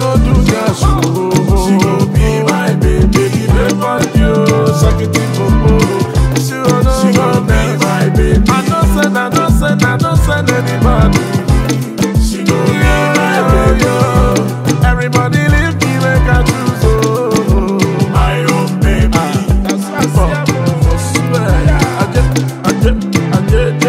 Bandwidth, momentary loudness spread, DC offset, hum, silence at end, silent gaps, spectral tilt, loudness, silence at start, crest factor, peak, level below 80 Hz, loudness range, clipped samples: 16 kHz; 3 LU; under 0.1%; none; 0 s; none; -6 dB/octave; -11 LUFS; 0 s; 10 dB; 0 dBFS; -16 dBFS; 1 LU; under 0.1%